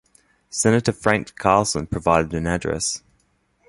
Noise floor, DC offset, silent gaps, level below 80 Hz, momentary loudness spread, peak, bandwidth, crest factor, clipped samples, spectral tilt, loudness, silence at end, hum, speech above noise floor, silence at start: -65 dBFS; under 0.1%; none; -42 dBFS; 6 LU; -2 dBFS; 11.5 kHz; 20 dB; under 0.1%; -4.5 dB/octave; -21 LUFS; 0.7 s; none; 44 dB; 0.55 s